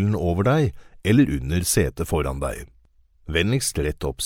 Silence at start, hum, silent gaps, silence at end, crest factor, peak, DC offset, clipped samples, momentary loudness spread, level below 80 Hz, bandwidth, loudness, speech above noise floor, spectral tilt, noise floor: 0 s; none; none; 0 s; 18 dB; -6 dBFS; under 0.1%; under 0.1%; 9 LU; -36 dBFS; 17 kHz; -22 LUFS; 34 dB; -5 dB/octave; -56 dBFS